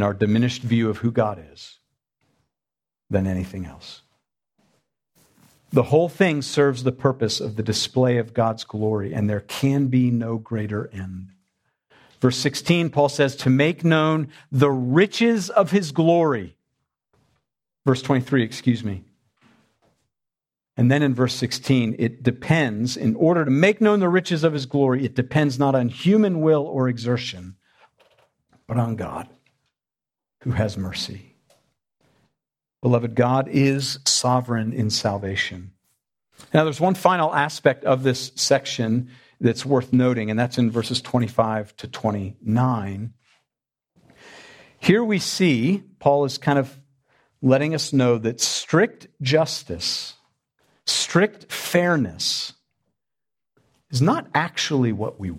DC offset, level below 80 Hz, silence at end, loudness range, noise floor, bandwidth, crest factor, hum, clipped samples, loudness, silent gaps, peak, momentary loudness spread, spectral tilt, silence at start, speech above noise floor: under 0.1%; -58 dBFS; 0 s; 8 LU; under -90 dBFS; 15.5 kHz; 22 dB; none; under 0.1%; -21 LUFS; none; -2 dBFS; 10 LU; -5.5 dB/octave; 0 s; over 69 dB